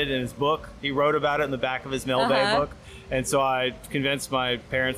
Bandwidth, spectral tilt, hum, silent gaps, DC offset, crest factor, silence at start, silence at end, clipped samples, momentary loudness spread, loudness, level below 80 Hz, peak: 16 kHz; -4 dB/octave; none; none; under 0.1%; 14 dB; 0 s; 0 s; under 0.1%; 7 LU; -25 LUFS; -48 dBFS; -12 dBFS